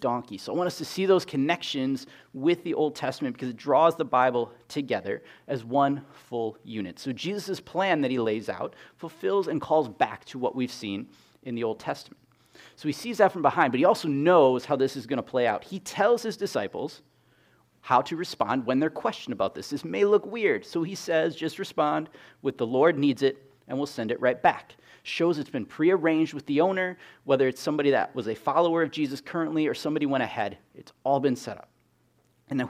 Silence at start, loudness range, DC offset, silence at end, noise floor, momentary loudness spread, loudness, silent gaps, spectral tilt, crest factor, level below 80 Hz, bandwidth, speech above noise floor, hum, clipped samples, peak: 0 s; 5 LU; under 0.1%; 0 s; -66 dBFS; 12 LU; -27 LUFS; none; -5.5 dB/octave; 22 dB; -72 dBFS; 15.5 kHz; 40 dB; none; under 0.1%; -6 dBFS